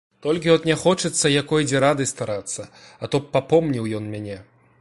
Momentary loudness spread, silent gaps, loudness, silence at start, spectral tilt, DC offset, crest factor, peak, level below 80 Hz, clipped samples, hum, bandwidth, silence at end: 14 LU; none; -21 LUFS; 0.25 s; -4.5 dB/octave; under 0.1%; 18 dB; -4 dBFS; -54 dBFS; under 0.1%; none; 11.5 kHz; 0.4 s